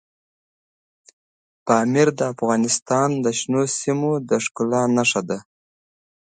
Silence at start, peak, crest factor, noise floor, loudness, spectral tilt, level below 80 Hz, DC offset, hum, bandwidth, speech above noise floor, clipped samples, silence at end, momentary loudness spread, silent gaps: 1.65 s; -2 dBFS; 20 dB; under -90 dBFS; -20 LUFS; -4.5 dB/octave; -68 dBFS; under 0.1%; none; 9.4 kHz; over 70 dB; under 0.1%; 1 s; 5 LU; 2.82-2.86 s